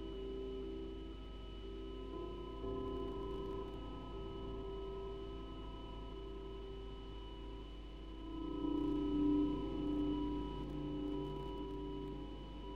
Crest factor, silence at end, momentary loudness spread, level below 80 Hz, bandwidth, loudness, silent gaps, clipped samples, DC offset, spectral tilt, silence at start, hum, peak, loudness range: 16 dB; 0 s; 13 LU; -50 dBFS; 6.8 kHz; -44 LUFS; none; under 0.1%; under 0.1%; -8.5 dB/octave; 0 s; none; -26 dBFS; 9 LU